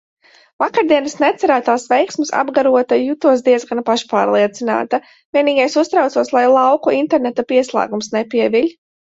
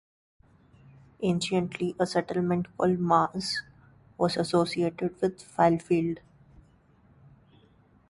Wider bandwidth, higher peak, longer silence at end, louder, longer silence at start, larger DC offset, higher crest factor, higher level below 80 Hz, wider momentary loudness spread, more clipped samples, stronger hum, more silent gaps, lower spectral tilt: second, 8 kHz vs 11.5 kHz; first, 0 dBFS vs -8 dBFS; second, 0.5 s vs 1.9 s; first, -15 LUFS vs -28 LUFS; second, 0.6 s vs 1.2 s; neither; second, 14 dB vs 20 dB; about the same, -64 dBFS vs -62 dBFS; about the same, 6 LU vs 8 LU; neither; neither; first, 5.25-5.33 s vs none; second, -4 dB/octave vs -6 dB/octave